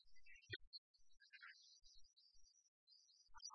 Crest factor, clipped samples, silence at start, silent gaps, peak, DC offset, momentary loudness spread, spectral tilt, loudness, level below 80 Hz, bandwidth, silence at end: 28 dB; under 0.1%; 0 s; 0.67-0.72 s, 0.78-0.94 s, 2.68-2.87 s; -36 dBFS; under 0.1%; 13 LU; -0.5 dB/octave; -60 LUFS; -80 dBFS; 6.2 kHz; 0 s